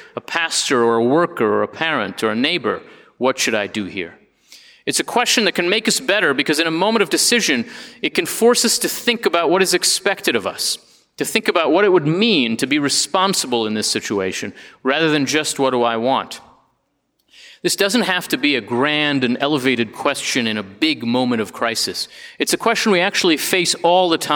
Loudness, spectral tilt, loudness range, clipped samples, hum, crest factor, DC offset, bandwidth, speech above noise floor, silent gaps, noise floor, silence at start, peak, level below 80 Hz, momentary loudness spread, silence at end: -17 LUFS; -2.5 dB/octave; 4 LU; under 0.1%; none; 18 dB; under 0.1%; over 20 kHz; 50 dB; none; -68 dBFS; 0 s; 0 dBFS; -66 dBFS; 8 LU; 0 s